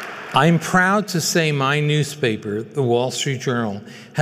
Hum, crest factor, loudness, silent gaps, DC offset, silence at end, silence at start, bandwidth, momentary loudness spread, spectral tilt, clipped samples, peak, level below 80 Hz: none; 16 dB; -19 LUFS; none; under 0.1%; 0 s; 0 s; 16 kHz; 9 LU; -4.5 dB/octave; under 0.1%; -4 dBFS; -58 dBFS